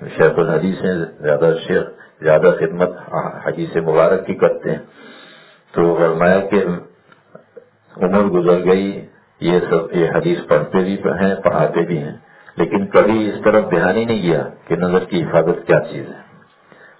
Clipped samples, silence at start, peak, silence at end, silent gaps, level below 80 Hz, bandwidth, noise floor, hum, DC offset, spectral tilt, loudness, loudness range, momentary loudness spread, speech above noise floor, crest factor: under 0.1%; 0 s; 0 dBFS; 0.8 s; none; -50 dBFS; 4 kHz; -47 dBFS; none; under 0.1%; -11 dB/octave; -16 LUFS; 2 LU; 10 LU; 31 dB; 16 dB